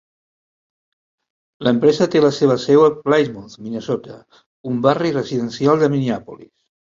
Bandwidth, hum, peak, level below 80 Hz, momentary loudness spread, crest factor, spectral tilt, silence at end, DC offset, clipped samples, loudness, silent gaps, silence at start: 7.6 kHz; none; -2 dBFS; -58 dBFS; 13 LU; 16 dB; -6.5 dB/octave; 0.5 s; under 0.1%; under 0.1%; -17 LUFS; 4.46-4.64 s; 1.6 s